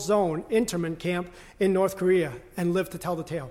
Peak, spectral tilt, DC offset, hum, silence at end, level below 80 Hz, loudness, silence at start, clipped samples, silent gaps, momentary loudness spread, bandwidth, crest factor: -12 dBFS; -6 dB/octave; under 0.1%; none; 0 s; -54 dBFS; -27 LUFS; 0 s; under 0.1%; none; 8 LU; 16.5 kHz; 14 dB